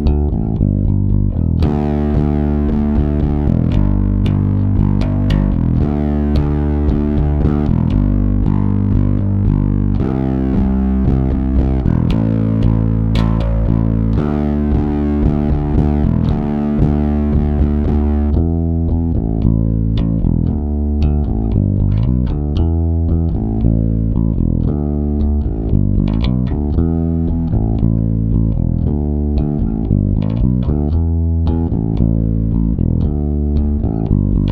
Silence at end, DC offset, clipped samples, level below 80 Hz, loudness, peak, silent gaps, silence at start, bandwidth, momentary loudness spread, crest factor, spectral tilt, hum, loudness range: 0 s; under 0.1%; under 0.1%; -18 dBFS; -16 LUFS; 0 dBFS; none; 0 s; 5 kHz; 2 LU; 14 dB; -11 dB/octave; none; 1 LU